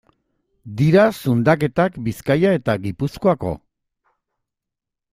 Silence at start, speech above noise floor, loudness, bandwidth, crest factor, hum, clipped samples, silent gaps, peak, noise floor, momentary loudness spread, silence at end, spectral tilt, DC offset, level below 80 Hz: 0.65 s; 66 dB; -19 LUFS; 16 kHz; 18 dB; none; under 0.1%; none; -2 dBFS; -84 dBFS; 11 LU; 1.55 s; -7.5 dB/octave; under 0.1%; -50 dBFS